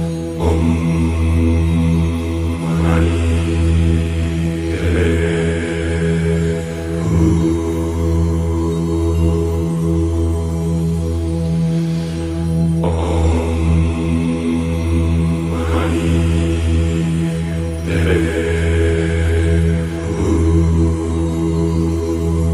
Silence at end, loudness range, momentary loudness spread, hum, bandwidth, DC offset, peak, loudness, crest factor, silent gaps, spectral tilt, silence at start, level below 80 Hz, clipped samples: 0 s; 2 LU; 4 LU; none; 12 kHz; under 0.1%; -2 dBFS; -17 LUFS; 14 dB; none; -7.5 dB/octave; 0 s; -24 dBFS; under 0.1%